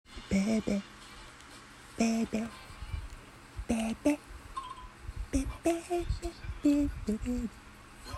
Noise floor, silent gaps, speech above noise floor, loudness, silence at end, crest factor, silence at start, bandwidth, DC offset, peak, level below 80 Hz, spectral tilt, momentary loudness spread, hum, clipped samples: -51 dBFS; none; 20 dB; -34 LUFS; 0 s; 18 dB; 0.1 s; 13.5 kHz; under 0.1%; -16 dBFS; -44 dBFS; -5.5 dB/octave; 19 LU; none; under 0.1%